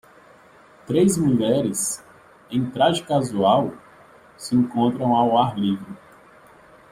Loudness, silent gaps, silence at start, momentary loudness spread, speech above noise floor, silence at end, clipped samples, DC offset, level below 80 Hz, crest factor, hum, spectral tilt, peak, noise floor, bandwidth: -21 LUFS; none; 0.9 s; 12 LU; 30 dB; 0.95 s; under 0.1%; under 0.1%; -58 dBFS; 18 dB; none; -5.5 dB/octave; -4 dBFS; -50 dBFS; 15.5 kHz